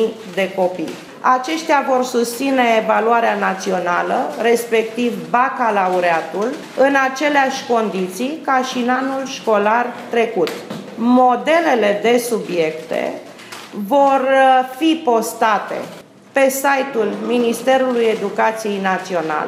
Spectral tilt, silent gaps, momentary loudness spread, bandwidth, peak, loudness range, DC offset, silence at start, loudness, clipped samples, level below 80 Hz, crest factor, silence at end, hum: -4 dB/octave; none; 9 LU; 16 kHz; -2 dBFS; 1 LU; under 0.1%; 0 s; -17 LUFS; under 0.1%; -74 dBFS; 16 dB; 0 s; none